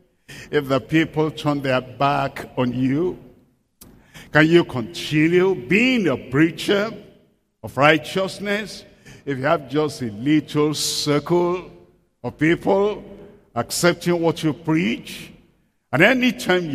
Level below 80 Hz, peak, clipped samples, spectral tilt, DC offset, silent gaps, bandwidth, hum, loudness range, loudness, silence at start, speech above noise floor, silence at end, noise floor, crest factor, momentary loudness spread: -54 dBFS; 0 dBFS; under 0.1%; -5 dB/octave; under 0.1%; none; 15.5 kHz; none; 4 LU; -20 LUFS; 0.3 s; 41 dB; 0 s; -61 dBFS; 20 dB; 13 LU